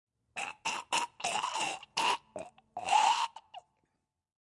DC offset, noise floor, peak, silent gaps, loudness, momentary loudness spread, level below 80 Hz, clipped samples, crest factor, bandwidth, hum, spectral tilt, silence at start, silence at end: under 0.1%; -81 dBFS; -14 dBFS; none; -32 LUFS; 18 LU; -82 dBFS; under 0.1%; 20 dB; 11.5 kHz; none; 0 dB/octave; 0.35 s; 1 s